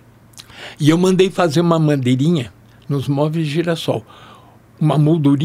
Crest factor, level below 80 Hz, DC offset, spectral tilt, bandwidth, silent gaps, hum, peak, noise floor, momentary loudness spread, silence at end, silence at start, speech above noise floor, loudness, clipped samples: 16 dB; -54 dBFS; under 0.1%; -7 dB/octave; 14.5 kHz; none; none; -2 dBFS; -44 dBFS; 10 LU; 0 s; 0.35 s; 29 dB; -16 LUFS; under 0.1%